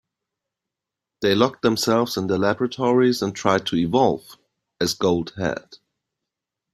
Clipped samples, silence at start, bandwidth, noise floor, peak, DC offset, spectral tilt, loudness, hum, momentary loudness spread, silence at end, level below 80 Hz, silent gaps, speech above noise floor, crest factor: under 0.1%; 1.2 s; 16 kHz; -86 dBFS; -2 dBFS; under 0.1%; -5 dB/octave; -21 LUFS; none; 8 LU; 1 s; -58 dBFS; none; 65 dB; 20 dB